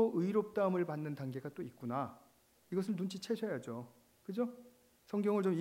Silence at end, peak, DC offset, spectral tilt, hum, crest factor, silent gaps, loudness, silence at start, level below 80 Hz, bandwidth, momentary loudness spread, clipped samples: 0 s; -20 dBFS; under 0.1%; -7.5 dB/octave; none; 18 dB; none; -38 LUFS; 0 s; -82 dBFS; 16 kHz; 13 LU; under 0.1%